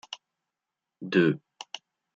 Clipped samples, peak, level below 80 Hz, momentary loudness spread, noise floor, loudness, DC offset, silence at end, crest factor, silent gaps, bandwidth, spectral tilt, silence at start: under 0.1%; -8 dBFS; -78 dBFS; 19 LU; -88 dBFS; -26 LUFS; under 0.1%; 0.4 s; 22 dB; none; 7.6 kHz; -6 dB/octave; 0.1 s